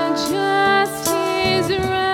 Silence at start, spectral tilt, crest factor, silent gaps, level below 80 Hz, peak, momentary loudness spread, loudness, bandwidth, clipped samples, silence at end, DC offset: 0 s; -3.5 dB/octave; 14 dB; none; -46 dBFS; -4 dBFS; 4 LU; -18 LUFS; 18.5 kHz; under 0.1%; 0 s; under 0.1%